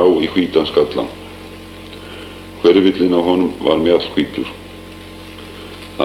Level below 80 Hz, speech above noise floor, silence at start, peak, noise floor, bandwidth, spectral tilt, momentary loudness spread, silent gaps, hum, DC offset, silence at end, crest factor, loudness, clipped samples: -44 dBFS; 20 dB; 0 s; 0 dBFS; -34 dBFS; 15 kHz; -6.5 dB/octave; 21 LU; none; none; under 0.1%; 0 s; 16 dB; -15 LUFS; under 0.1%